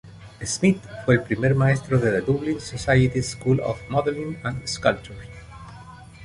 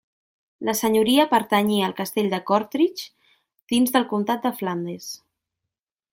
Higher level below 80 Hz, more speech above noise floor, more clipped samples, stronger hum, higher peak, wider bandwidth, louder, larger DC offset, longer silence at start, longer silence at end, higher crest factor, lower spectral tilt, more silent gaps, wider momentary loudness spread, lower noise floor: first, -44 dBFS vs -66 dBFS; second, 21 dB vs 64 dB; neither; neither; about the same, -4 dBFS vs -6 dBFS; second, 11.5 kHz vs 17 kHz; about the same, -23 LUFS vs -22 LUFS; neither; second, 0.05 s vs 0.6 s; second, 0 s vs 0.95 s; about the same, 20 dB vs 18 dB; first, -6 dB/octave vs -4.5 dB/octave; second, none vs 3.63-3.67 s; first, 21 LU vs 15 LU; second, -43 dBFS vs -86 dBFS